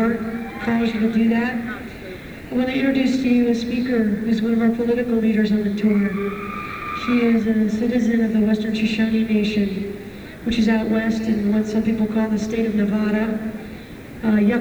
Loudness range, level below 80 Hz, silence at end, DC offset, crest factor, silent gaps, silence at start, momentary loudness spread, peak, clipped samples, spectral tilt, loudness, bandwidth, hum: 2 LU; -46 dBFS; 0 s; under 0.1%; 14 dB; none; 0 s; 11 LU; -6 dBFS; under 0.1%; -7 dB/octave; -20 LUFS; over 20 kHz; none